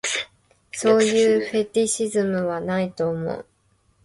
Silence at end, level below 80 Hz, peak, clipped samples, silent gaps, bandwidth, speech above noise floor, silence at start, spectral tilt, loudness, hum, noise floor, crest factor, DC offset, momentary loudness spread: 0.6 s; -60 dBFS; -6 dBFS; under 0.1%; none; 11.5 kHz; 43 dB; 0.05 s; -4 dB/octave; -22 LUFS; none; -63 dBFS; 16 dB; under 0.1%; 13 LU